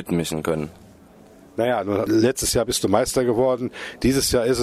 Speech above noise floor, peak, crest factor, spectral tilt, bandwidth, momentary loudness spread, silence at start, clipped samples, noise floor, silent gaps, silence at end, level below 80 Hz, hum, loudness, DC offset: 27 dB; -2 dBFS; 20 dB; -4.5 dB/octave; 15.5 kHz; 8 LU; 0 s; under 0.1%; -48 dBFS; none; 0 s; -42 dBFS; none; -21 LUFS; under 0.1%